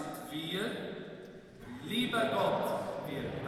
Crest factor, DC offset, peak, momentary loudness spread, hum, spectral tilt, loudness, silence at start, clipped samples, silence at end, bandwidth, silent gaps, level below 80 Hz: 16 dB; under 0.1%; -20 dBFS; 18 LU; none; -5 dB/octave; -35 LUFS; 0 s; under 0.1%; 0 s; 17 kHz; none; -64 dBFS